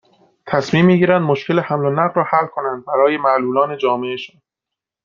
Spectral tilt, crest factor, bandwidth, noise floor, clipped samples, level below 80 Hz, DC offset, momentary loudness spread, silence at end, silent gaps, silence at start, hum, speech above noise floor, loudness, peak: -7.5 dB/octave; 16 dB; 7.4 kHz; -84 dBFS; under 0.1%; -58 dBFS; under 0.1%; 9 LU; 0.8 s; none; 0.45 s; none; 68 dB; -16 LUFS; -2 dBFS